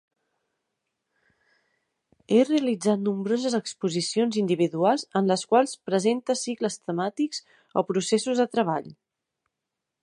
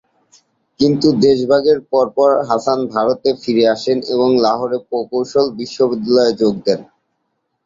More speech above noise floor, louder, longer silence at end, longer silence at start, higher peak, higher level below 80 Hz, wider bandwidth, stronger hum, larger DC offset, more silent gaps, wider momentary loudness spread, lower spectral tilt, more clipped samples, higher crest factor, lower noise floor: first, 60 dB vs 55 dB; second, -25 LUFS vs -15 LUFS; first, 1.1 s vs 0.8 s; first, 2.3 s vs 0.8 s; second, -6 dBFS vs 0 dBFS; second, -78 dBFS vs -54 dBFS; first, 11.5 kHz vs 7.6 kHz; neither; neither; neither; about the same, 7 LU vs 7 LU; about the same, -5 dB/octave vs -6 dB/octave; neither; first, 20 dB vs 14 dB; first, -85 dBFS vs -70 dBFS